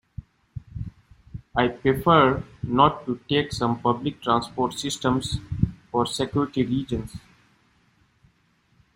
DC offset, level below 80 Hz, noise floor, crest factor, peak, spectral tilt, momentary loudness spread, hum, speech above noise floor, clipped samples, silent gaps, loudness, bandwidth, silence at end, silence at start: under 0.1%; -46 dBFS; -64 dBFS; 22 dB; -2 dBFS; -5.5 dB/octave; 21 LU; none; 41 dB; under 0.1%; none; -24 LUFS; 16 kHz; 1.75 s; 0.2 s